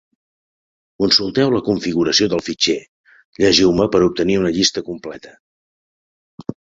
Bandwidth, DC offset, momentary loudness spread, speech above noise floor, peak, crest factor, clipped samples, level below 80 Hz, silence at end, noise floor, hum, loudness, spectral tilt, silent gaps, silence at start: 7.8 kHz; under 0.1%; 18 LU; over 73 dB; 0 dBFS; 18 dB; under 0.1%; -48 dBFS; 0.2 s; under -90 dBFS; none; -16 LUFS; -4 dB/octave; 2.88-3.04 s, 3.25-3.33 s, 5.40-6.38 s; 1 s